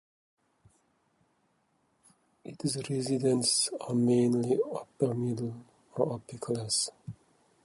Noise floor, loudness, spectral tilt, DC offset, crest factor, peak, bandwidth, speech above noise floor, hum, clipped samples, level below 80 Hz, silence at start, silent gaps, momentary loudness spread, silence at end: -73 dBFS; -30 LUFS; -5 dB/octave; under 0.1%; 20 dB; -12 dBFS; 11.5 kHz; 43 dB; none; under 0.1%; -70 dBFS; 2.45 s; none; 18 LU; 0.5 s